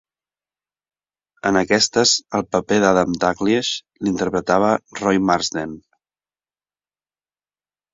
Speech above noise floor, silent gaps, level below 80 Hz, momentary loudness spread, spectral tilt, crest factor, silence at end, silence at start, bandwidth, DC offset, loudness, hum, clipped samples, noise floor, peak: over 71 dB; none; -52 dBFS; 8 LU; -3.5 dB/octave; 20 dB; 2.15 s; 1.45 s; 7.8 kHz; under 0.1%; -18 LUFS; 50 Hz at -50 dBFS; under 0.1%; under -90 dBFS; -2 dBFS